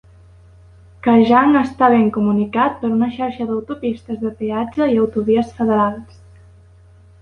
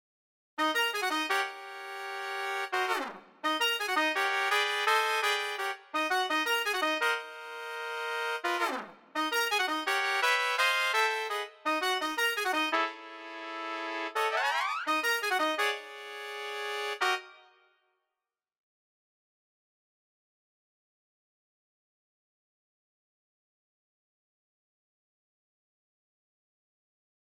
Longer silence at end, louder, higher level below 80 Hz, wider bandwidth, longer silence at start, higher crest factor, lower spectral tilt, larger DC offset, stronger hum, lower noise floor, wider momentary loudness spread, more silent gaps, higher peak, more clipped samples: second, 1.15 s vs 9.8 s; first, -17 LUFS vs -30 LUFS; first, -48 dBFS vs -80 dBFS; second, 6.6 kHz vs over 20 kHz; first, 1.05 s vs 0.6 s; about the same, 16 dB vs 20 dB; first, -8 dB/octave vs 0.5 dB/octave; neither; neither; second, -46 dBFS vs under -90 dBFS; about the same, 12 LU vs 12 LU; neither; first, -2 dBFS vs -12 dBFS; neither